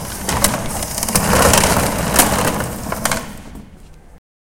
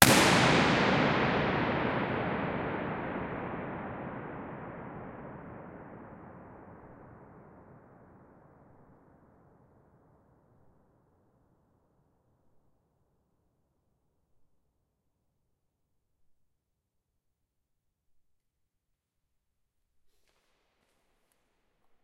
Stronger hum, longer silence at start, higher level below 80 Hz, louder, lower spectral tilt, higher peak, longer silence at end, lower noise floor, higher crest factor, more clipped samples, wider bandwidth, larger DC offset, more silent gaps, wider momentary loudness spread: neither; about the same, 0 s vs 0 s; first, -30 dBFS vs -58 dBFS; first, -16 LUFS vs -29 LUFS; about the same, -3 dB/octave vs -4 dB/octave; about the same, 0 dBFS vs 0 dBFS; second, 0.3 s vs 14.45 s; second, -40 dBFS vs -83 dBFS; second, 18 dB vs 34 dB; neither; first, 17.5 kHz vs 13 kHz; neither; neither; second, 12 LU vs 26 LU